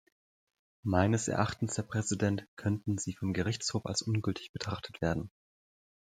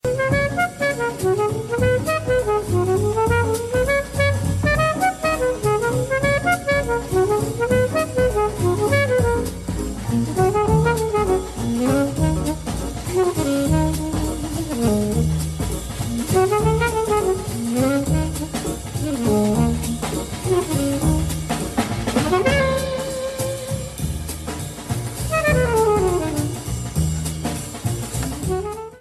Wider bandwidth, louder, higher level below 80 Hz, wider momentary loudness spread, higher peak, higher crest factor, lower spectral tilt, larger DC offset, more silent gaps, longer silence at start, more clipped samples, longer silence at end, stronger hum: second, 10 kHz vs 14 kHz; second, -33 LUFS vs -21 LUFS; second, -60 dBFS vs -32 dBFS; about the same, 9 LU vs 8 LU; second, -12 dBFS vs -4 dBFS; first, 22 dB vs 16 dB; about the same, -5 dB/octave vs -5.5 dB/octave; neither; first, 2.48-2.57 s, 4.49-4.54 s vs none; first, 0.85 s vs 0.05 s; neither; first, 0.85 s vs 0 s; neither